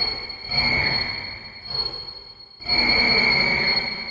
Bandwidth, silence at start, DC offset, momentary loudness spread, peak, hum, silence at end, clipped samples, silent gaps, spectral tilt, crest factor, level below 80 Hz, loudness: 7.8 kHz; 0 s; under 0.1%; 17 LU; -6 dBFS; none; 0 s; under 0.1%; none; -4 dB/octave; 16 dB; -44 dBFS; -19 LUFS